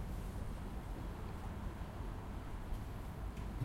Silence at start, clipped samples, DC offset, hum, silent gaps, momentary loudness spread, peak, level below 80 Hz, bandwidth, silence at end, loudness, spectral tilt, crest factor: 0 s; under 0.1%; under 0.1%; none; none; 2 LU; -28 dBFS; -46 dBFS; 16.5 kHz; 0 s; -47 LUFS; -7 dB/octave; 16 dB